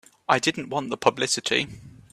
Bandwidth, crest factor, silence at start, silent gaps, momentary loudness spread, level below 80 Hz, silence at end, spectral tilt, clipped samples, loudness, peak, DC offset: 15.5 kHz; 22 dB; 0.3 s; none; 7 LU; -62 dBFS; 0.25 s; -2.5 dB/octave; under 0.1%; -24 LUFS; -4 dBFS; under 0.1%